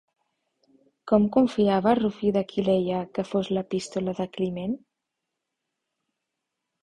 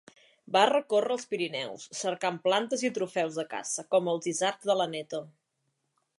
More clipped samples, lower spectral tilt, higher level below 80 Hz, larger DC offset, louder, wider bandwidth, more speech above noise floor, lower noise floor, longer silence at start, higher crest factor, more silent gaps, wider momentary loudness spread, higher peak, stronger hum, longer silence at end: neither; first, -7 dB/octave vs -3 dB/octave; first, -60 dBFS vs -84 dBFS; neither; first, -25 LUFS vs -29 LUFS; about the same, 10.5 kHz vs 11.5 kHz; first, 59 dB vs 50 dB; first, -83 dBFS vs -79 dBFS; first, 1.05 s vs 0.5 s; about the same, 20 dB vs 22 dB; neither; about the same, 9 LU vs 10 LU; about the same, -6 dBFS vs -8 dBFS; neither; first, 2.05 s vs 0.9 s